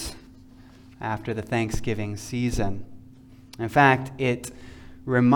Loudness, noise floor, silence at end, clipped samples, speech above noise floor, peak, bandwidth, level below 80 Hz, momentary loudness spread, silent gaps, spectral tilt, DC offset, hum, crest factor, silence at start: -25 LUFS; -48 dBFS; 0 s; under 0.1%; 25 dB; -4 dBFS; 18.5 kHz; -42 dBFS; 21 LU; none; -6 dB/octave; under 0.1%; none; 20 dB; 0 s